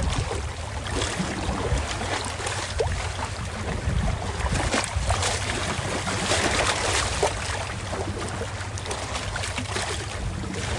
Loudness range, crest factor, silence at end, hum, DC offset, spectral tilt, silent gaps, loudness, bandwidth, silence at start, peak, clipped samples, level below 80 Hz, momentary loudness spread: 4 LU; 20 dB; 0 s; none; under 0.1%; -3.5 dB/octave; none; -27 LUFS; 11.5 kHz; 0 s; -8 dBFS; under 0.1%; -34 dBFS; 8 LU